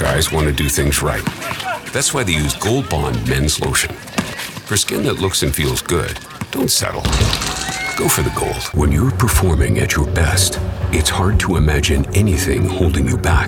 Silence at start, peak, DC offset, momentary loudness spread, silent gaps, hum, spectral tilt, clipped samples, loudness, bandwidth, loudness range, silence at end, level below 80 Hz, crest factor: 0 s; -2 dBFS; under 0.1%; 6 LU; none; none; -4 dB/octave; under 0.1%; -17 LUFS; over 20 kHz; 2 LU; 0 s; -26 dBFS; 16 dB